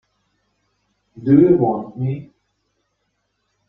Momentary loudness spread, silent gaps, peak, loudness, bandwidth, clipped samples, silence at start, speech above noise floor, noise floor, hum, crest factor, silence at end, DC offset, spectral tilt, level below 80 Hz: 15 LU; none; -2 dBFS; -17 LUFS; 3.8 kHz; under 0.1%; 1.15 s; 55 dB; -71 dBFS; none; 18 dB; 1.45 s; under 0.1%; -12.5 dB/octave; -56 dBFS